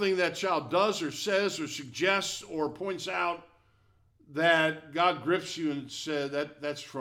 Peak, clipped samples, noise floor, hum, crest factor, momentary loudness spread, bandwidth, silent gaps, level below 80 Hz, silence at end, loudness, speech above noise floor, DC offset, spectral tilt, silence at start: -10 dBFS; under 0.1%; -66 dBFS; none; 20 dB; 10 LU; 17 kHz; none; -70 dBFS; 0 s; -29 LUFS; 36 dB; under 0.1%; -3.5 dB/octave; 0 s